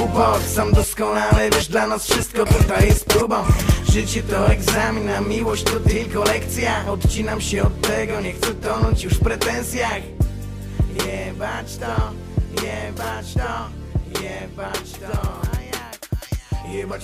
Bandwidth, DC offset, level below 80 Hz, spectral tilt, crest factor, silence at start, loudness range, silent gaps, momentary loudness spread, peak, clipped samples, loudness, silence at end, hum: 16 kHz; under 0.1%; -26 dBFS; -5 dB/octave; 14 dB; 0 s; 9 LU; none; 11 LU; -6 dBFS; under 0.1%; -21 LUFS; 0 s; none